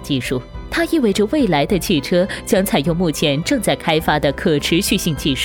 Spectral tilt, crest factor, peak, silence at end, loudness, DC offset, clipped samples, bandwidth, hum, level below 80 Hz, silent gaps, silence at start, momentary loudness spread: -4.5 dB/octave; 14 dB; -2 dBFS; 0 s; -17 LUFS; under 0.1%; under 0.1%; 19.5 kHz; none; -36 dBFS; none; 0 s; 5 LU